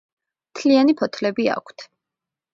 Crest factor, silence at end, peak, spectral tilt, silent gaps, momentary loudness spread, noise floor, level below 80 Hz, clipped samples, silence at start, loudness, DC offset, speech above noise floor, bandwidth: 18 dB; 0.7 s; -4 dBFS; -5 dB/octave; none; 18 LU; -86 dBFS; -70 dBFS; under 0.1%; 0.55 s; -20 LUFS; under 0.1%; 67 dB; 7.6 kHz